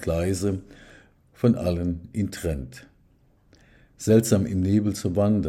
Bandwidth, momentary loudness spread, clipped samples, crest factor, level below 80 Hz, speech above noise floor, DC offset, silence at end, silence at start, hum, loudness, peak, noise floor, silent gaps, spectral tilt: 16 kHz; 11 LU; under 0.1%; 20 dB; -46 dBFS; 37 dB; under 0.1%; 0 s; 0 s; none; -24 LUFS; -6 dBFS; -60 dBFS; none; -7 dB/octave